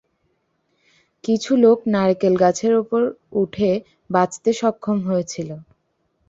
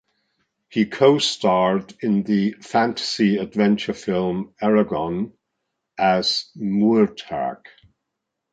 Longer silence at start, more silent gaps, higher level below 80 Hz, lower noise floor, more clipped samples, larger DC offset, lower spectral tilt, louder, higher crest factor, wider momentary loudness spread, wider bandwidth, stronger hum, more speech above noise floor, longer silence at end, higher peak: first, 1.25 s vs 0.7 s; neither; about the same, -60 dBFS vs -58 dBFS; second, -68 dBFS vs -80 dBFS; neither; neither; about the same, -6 dB/octave vs -5.5 dB/octave; about the same, -19 LUFS vs -21 LUFS; about the same, 18 dB vs 18 dB; about the same, 12 LU vs 10 LU; second, 8 kHz vs 9.2 kHz; neither; second, 50 dB vs 60 dB; second, 0.65 s vs 1 s; about the same, -2 dBFS vs -2 dBFS